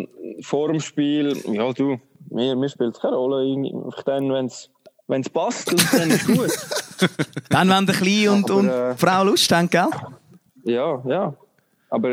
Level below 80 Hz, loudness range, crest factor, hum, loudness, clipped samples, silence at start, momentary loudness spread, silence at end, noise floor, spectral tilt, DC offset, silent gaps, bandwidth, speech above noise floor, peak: -62 dBFS; 6 LU; 20 dB; none; -20 LUFS; under 0.1%; 0 s; 11 LU; 0 s; -51 dBFS; -4.5 dB/octave; under 0.1%; none; 16.5 kHz; 31 dB; -2 dBFS